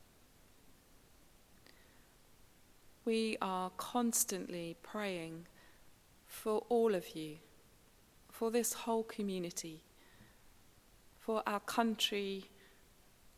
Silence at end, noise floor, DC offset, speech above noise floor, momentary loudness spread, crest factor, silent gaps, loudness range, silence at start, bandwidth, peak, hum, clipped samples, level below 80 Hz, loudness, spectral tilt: 0.9 s; -65 dBFS; under 0.1%; 28 dB; 16 LU; 24 dB; none; 4 LU; 0 s; 16 kHz; -16 dBFS; none; under 0.1%; -72 dBFS; -38 LUFS; -3 dB/octave